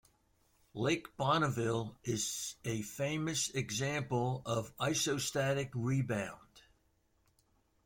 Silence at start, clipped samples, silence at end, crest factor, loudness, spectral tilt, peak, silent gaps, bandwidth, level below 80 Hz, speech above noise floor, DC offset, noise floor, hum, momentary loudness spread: 0.75 s; under 0.1%; 1.25 s; 20 dB; -35 LUFS; -4 dB/octave; -18 dBFS; none; 16.5 kHz; -66 dBFS; 39 dB; under 0.1%; -74 dBFS; none; 7 LU